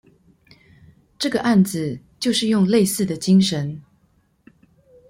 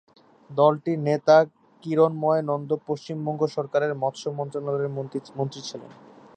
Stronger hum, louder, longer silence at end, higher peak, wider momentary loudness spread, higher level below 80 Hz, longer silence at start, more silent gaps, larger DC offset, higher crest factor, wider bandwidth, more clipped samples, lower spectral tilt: neither; first, -19 LUFS vs -24 LUFS; first, 1.3 s vs 0.45 s; about the same, -6 dBFS vs -6 dBFS; second, 11 LU vs 14 LU; first, -58 dBFS vs -76 dBFS; first, 1.2 s vs 0.5 s; neither; neither; about the same, 16 dB vs 20 dB; first, 16.5 kHz vs 9 kHz; neither; about the same, -5.5 dB/octave vs -6.5 dB/octave